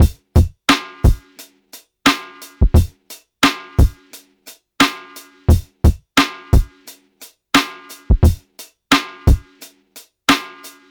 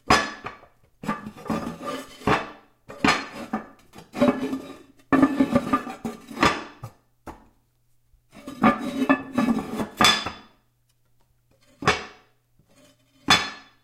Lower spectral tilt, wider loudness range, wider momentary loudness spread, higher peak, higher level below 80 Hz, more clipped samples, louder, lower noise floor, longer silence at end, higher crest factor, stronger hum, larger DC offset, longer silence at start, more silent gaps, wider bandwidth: about the same, -5 dB/octave vs -4 dB/octave; second, 1 LU vs 4 LU; about the same, 21 LU vs 22 LU; about the same, -2 dBFS vs -2 dBFS; first, -20 dBFS vs -50 dBFS; neither; first, -17 LUFS vs -24 LUFS; second, -45 dBFS vs -66 dBFS; about the same, 0.25 s vs 0.2 s; second, 16 dB vs 24 dB; neither; neither; about the same, 0 s vs 0.05 s; neither; first, 19.5 kHz vs 16 kHz